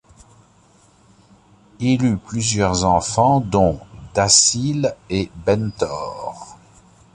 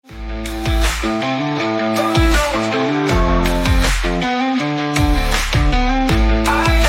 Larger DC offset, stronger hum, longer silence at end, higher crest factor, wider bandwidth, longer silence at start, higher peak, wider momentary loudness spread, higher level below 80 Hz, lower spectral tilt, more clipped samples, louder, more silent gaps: neither; neither; first, 0.6 s vs 0 s; first, 20 dB vs 14 dB; second, 11.5 kHz vs 16.5 kHz; first, 1.8 s vs 0.1 s; about the same, 0 dBFS vs -2 dBFS; first, 15 LU vs 4 LU; second, -42 dBFS vs -20 dBFS; about the same, -4 dB/octave vs -5 dB/octave; neither; about the same, -18 LUFS vs -17 LUFS; neither